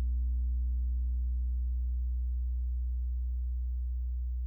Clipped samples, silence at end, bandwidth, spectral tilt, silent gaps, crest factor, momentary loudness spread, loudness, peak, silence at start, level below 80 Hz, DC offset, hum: under 0.1%; 0 s; 0.3 kHz; -11 dB/octave; none; 4 dB; 3 LU; -35 LUFS; -26 dBFS; 0 s; -32 dBFS; under 0.1%; none